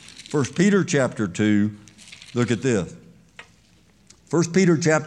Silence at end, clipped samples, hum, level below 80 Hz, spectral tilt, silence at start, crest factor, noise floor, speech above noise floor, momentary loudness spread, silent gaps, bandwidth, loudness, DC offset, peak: 0 s; under 0.1%; none; -62 dBFS; -5.5 dB/octave; 0.2 s; 18 dB; -56 dBFS; 36 dB; 11 LU; none; 10.5 kHz; -21 LUFS; under 0.1%; -4 dBFS